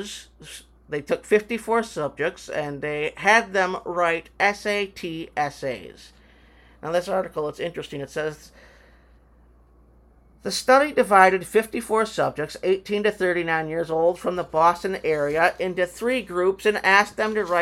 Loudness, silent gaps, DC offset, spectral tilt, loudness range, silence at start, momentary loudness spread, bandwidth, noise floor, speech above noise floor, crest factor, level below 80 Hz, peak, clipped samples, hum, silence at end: -23 LUFS; none; under 0.1%; -4 dB/octave; 9 LU; 0 s; 14 LU; 16.5 kHz; -54 dBFS; 31 dB; 22 dB; -54 dBFS; 0 dBFS; under 0.1%; none; 0 s